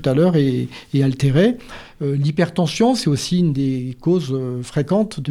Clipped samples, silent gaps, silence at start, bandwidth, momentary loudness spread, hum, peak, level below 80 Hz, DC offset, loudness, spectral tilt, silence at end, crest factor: under 0.1%; none; 0 s; 12.5 kHz; 8 LU; none; -4 dBFS; -46 dBFS; under 0.1%; -19 LUFS; -7 dB/octave; 0 s; 14 dB